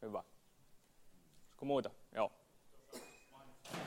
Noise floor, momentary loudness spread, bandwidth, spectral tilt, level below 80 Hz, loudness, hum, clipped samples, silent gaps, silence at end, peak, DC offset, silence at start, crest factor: -67 dBFS; 22 LU; 16 kHz; -5 dB/octave; -76 dBFS; -43 LUFS; none; under 0.1%; none; 0 s; -22 dBFS; under 0.1%; 0 s; 24 dB